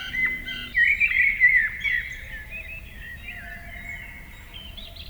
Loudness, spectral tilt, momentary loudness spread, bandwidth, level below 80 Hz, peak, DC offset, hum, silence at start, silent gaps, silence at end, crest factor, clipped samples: -20 LUFS; -2.5 dB/octave; 22 LU; over 20 kHz; -44 dBFS; -8 dBFS; under 0.1%; none; 0 s; none; 0 s; 18 dB; under 0.1%